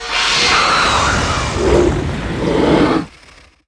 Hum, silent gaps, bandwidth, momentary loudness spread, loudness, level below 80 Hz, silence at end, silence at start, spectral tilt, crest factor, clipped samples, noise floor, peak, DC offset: none; none; 11 kHz; 9 LU; -14 LUFS; -28 dBFS; 0.6 s; 0 s; -4 dB/octave; 14 dB; under 0.1%; -44 dBFS; 0 dBFS; under 0.1%